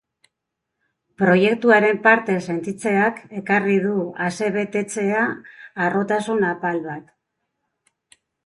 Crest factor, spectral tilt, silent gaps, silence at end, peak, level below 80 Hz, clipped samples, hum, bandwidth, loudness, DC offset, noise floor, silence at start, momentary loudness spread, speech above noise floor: 20 dB; -6 dB/octave; none; 1.45 s; -2 dBFS; -66 dBFS; under 0.1%; none; 11.5 kHz; -20 LUFS; under 0.1%; -81 dBFS; 1.2 s; 12 LU; 61 dB